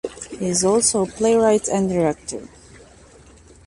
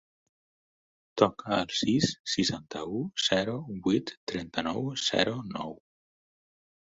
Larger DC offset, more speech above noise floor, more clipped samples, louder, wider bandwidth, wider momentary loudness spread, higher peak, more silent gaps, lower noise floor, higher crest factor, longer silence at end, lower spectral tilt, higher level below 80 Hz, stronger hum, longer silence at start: neither; second, 28 dB vs over 60 dB; neither; first, -19 LUFS vs -29 LUFS; first, 11.5 kHz vs 8.2 kHz; first, 15 LU vs 10 LU; about the same, -4 dBFS vs -6 dBFS; second, none vs 2.20-2.25 s, 4.17-4.27 s; second, -47 dBFS vs under -90 dBFS; second, 16 dB vs 26 dB; about the same, 1.2 s vs 1.15 s; about the same, -4 dB/octave vs -4 dB/octave; first, -50 dBFS vs -62 dBFS; neither; second, 0.05 s vs 1.15 s